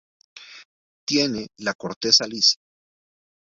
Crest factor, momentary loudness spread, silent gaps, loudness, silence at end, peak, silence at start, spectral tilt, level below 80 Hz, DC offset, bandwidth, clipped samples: 24 dB; 13 LU; 0.65-1.07 s, 1.75-1.79 s, 1.96-2.01 s; -20 LUFS; 0.9 s; -2 dBFS; 0.35 s; -2 dB/octave; -64 dBFS; under 0.1%; 7.8 kHz; under 0.1%